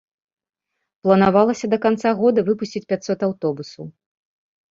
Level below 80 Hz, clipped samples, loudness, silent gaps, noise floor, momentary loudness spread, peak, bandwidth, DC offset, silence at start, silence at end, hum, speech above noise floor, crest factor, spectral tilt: -58 dBFS; under 0.1%; -19 LUFS; none; -79 dBFS; 16 LU; -2 dBFS; 7.6 kHz; under 0.1%; 1.05 s; 0.8 s; none; 60 dB; 18 dB; -6.5 dB/octave